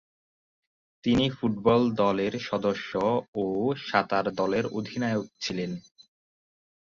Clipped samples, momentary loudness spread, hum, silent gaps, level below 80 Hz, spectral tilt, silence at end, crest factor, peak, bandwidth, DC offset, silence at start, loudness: under 0.1%; 9 LU; none; 3.28-3.33 s; -56 dBFS; -6 dB/octave; 1.05 s; 20 dB; -8 dBFS; 7.4 kHz; under 0.1%; 1.05 s; -27 LUFS